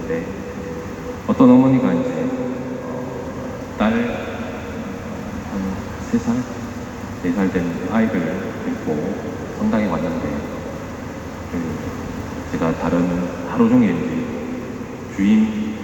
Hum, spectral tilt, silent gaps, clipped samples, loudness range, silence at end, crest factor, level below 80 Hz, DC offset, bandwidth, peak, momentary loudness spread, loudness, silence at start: none; -7 dB/octave; none; under 0.1%; 6 LU; 0 s; 20 dB; -42 dBFS; under 0.1%; 19.5 kHz; 0 dBFS; 13 LU; -21 LUFS; 0 s